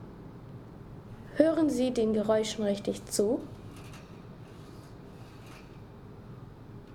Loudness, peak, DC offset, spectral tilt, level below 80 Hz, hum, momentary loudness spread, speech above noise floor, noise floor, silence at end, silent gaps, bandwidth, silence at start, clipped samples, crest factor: -29 LUFS; -8 dBFS; under 0.1%; -5.5 dB/octave; -56 dBFS; none; 22 LU; 20 dB; -48 dBFS; 0 s; none; 18.5 kHz; 0 s; under 0.1%; 24 dB